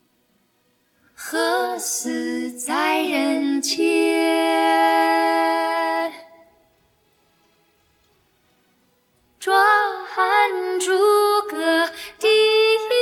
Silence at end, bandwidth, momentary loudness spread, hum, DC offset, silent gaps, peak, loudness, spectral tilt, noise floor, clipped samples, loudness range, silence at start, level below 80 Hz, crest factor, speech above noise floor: 0 s; 18 kHz; 9 LU; none; under 0.1%; none; -2 dBFS; -19 LUFS; -0.5 dB/octave; -65 dBFS; under 0.1%; 8 LU; 1.2 s; -74 dBFS; 18 dB; 43 dB